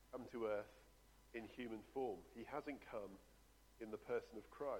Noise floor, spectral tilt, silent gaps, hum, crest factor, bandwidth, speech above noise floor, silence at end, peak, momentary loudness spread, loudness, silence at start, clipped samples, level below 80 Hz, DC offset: -69 dBFS; -6 dB/octave; none; none; 18 dB; 19 kHz; 20 dB; 0 s; -32 dBFS; 12 LU; -50 LUFS; 0 s; under 0.1%; -72 dBFS; under 0.1%